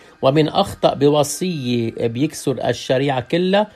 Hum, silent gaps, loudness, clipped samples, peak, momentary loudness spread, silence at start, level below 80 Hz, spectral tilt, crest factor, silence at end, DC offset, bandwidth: none; none; -18 LUFS; under 0.1%; -2 dBFS; 6 LU; 0.2 s; -52 dBFS; -5.5 dB/octave; 16 dB; 0.05 s; under 0.1%; 14.5 kHz